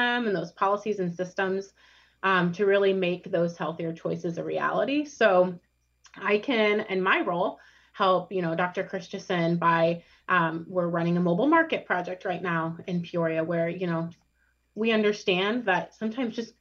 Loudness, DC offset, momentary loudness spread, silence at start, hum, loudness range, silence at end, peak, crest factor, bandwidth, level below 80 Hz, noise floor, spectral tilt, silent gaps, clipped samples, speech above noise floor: -26 LUFS; under 0.1%; 9 LU; 0 s; none; 2 LU; 0.1 s; -8 dBFS; 18 dB; 7 kHz; -72 dBFS; -69 dBFS; -6.5 dB/octave; none; under 0.1%; 43 dB